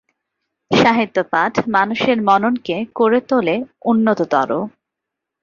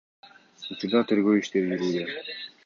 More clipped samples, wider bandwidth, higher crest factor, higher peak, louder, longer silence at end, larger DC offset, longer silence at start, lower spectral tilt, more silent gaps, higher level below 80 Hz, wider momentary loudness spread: neither; about the same, 7.2 kHz vs 7.4 kHz; about the same, 16 dB vs 18 dB; first, -2 dBFS vs -10 dBFS; first, -17 LUFS vs -26 LUFS; first, 0.75 s vs 0.2 s; neither; first, 0.7 s vs 0.25 s; about the same, -6 dB/octave vs -6 dB/octave; neither; first, -56 dBFS vs -70 dBFS; second, 7 LU vs 14 LU